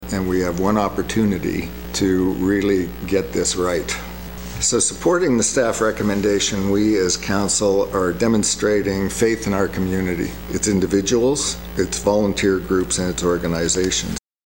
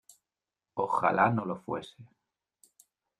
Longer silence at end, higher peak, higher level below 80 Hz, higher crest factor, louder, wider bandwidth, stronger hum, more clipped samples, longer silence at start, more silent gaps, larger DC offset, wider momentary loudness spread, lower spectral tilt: second, 0.3 s vs 1.15 s; first, -2 dBFS vs -10 dBFS; first, -38 dBFS vs -70 dBFS; second, 16 dB vs 22 dB; first, -19 LUFS vs -30 LUFS; first, 16.5 kHz vs 14.5 kHz; neither; neither; second, 0 s vs 0.75 s; neither; first, 0.6% vs under 0.1%; second, 6 LU vs 15 LU; second, -4 dB/octave vs -7 dB/octave